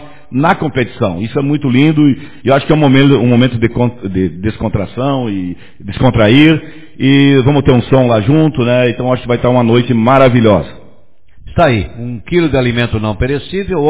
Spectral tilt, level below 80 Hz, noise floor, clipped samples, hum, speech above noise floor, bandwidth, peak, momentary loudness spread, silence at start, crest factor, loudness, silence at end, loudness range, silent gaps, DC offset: -11.5 dB/octave; -32 dBFS; -47 dBFS; 0.3%; none; 36 dB; 4 kHz; 0 dBFS; 10 LU; 0 s; 12 dB; -11 LUFS; 0 s; 3 LU; none; 2%